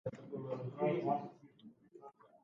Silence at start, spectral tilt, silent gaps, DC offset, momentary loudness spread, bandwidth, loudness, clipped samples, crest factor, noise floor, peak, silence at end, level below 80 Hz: 0.05 s; -7.5 dB/octave; none; under 0.1%; 24 LU; 7.2 kHz; -39 LUFS; under 0.1%; 18 dB; -61 dBFS; -22 dBFS; 0.2 s; -80 dBFS